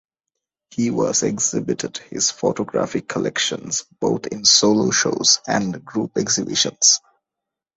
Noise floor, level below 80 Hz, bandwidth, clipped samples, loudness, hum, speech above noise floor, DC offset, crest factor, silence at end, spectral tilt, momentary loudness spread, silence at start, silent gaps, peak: -85 dBFS; -58 dBFS; 8.2 kHz; under 0.1%; -19 LUFS; none; 65 dB; under 0.1%; 20 dB; 0.8 s; -2.5 dB/octave; 11 LU; 0.75 s; none; -2 dBFS